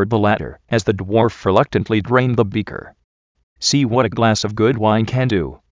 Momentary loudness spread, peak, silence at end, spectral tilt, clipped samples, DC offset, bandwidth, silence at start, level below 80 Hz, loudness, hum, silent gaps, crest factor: 6 LU; 0 dBFS; 0.15 s; -5.5 dB/octave; under 0.1%; under 0.1%; 7.6 kHz; 0 s; -42 dBFS; -17 LUFS; none; 3.04-3.35 s, 3.43-3.56 s; 16 dB